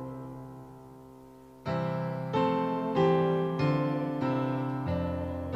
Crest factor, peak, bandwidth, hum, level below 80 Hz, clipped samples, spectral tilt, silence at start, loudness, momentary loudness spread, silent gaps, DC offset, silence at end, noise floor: 16 dB; -14 dBFS; 8 kHz; none; -60 dBFS; under 0.1%; -8.5 dB/octave; 0 s; -30 LUFS; 20 LU; none; under 0.1%; 0 s; -51 dBFS